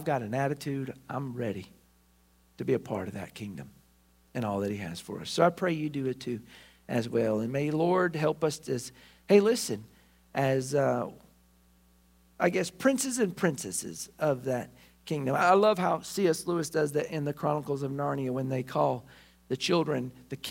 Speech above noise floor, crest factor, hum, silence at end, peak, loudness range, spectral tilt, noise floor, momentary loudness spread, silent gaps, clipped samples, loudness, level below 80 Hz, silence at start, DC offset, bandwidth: 35 dB; 22 dB; none; 0 s; -8 dBFS; 8 LU; -5.5 dB/octave; -64 dBFS; 13 LU; none; under 0.1%; -30 LUFS; -66 dBFS; 0 s; under 0.1%; 16 kHz